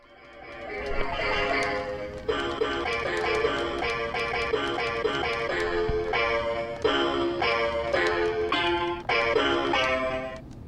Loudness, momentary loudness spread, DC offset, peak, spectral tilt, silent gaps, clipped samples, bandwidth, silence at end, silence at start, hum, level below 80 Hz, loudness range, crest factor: -26 LUFS; 7 LU; under 0.1%; -12 dBFS; -4.5 dB/octave; none; under 0.1%; 11.5 kHz; 0 s; 0.1 s; none; -44 dBFS; 3 LU; 16 dB